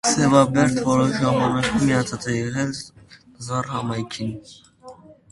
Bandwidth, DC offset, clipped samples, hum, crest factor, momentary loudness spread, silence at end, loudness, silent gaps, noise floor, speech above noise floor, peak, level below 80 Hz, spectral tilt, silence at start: 11.5 kHz; under 0.1%; under 0.1%; none; 22 dB; 15 LU; 0.2 s; -21 LUFS; none; -44 dBFS; 24 dB; 0 dBFS; -50 dBFS; -5 dB/octave; 0.05 s